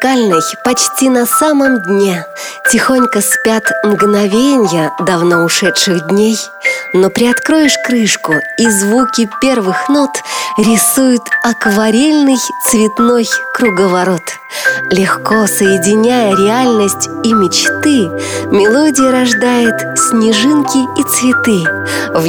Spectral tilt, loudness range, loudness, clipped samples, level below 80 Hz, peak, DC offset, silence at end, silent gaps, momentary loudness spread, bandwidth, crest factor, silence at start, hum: -3.5 dB/octave; 1 LU; -10 LUFS; under 0.1%; -50 dBFS; 0 dBFS; under 0.1%; 0 s; none; 5 LU; over 20 kHz; 10 dB; 0 s; none